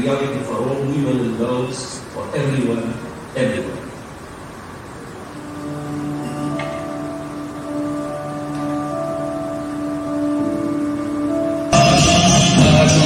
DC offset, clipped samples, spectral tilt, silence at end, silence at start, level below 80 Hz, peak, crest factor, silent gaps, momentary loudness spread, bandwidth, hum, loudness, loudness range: under 0.1%; under 0.1%; -4.5 dB/octave; 0 s; 0 s; -40 dBFS; 0 dBFS; 18 dB; none; 21 LU; 15.5 kHz; none; -19 LUFS; 11 LU